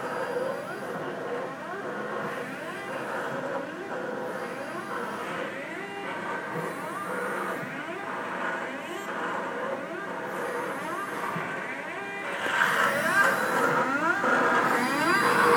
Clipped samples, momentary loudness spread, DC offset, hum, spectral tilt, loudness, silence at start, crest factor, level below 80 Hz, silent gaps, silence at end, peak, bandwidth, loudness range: under 0.1%; 11 LU; under 0.1%; none; -4 dB/octave; -29 LUFS; 0 s; 20 dB; -80 dBFS; none; 0 s; -10 dBFS; 19 kHz; 9 LU